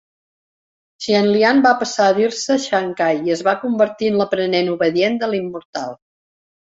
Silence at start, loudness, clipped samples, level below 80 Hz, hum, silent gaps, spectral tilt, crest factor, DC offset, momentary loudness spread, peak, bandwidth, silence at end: 1 s; -17 LUFS; under 0.1%; -62 dBFS; none; 5.65-5.73 s; -4.5 dB/octave; 16 dB; under 0.1%; 13 LU; -2 dBFS; 8 kHz; 0.8 s